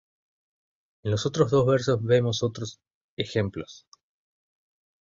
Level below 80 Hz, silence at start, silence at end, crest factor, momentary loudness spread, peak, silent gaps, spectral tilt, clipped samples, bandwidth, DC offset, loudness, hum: -56 dBFS; 1.05 s; 1.25 s; 22 dB; 16 LU; -6 dBFS; 2.94-3.17 s; -6 dB/octave; under 0.1%; 7.6 kHz; under 0.1%; -25 LUFS; none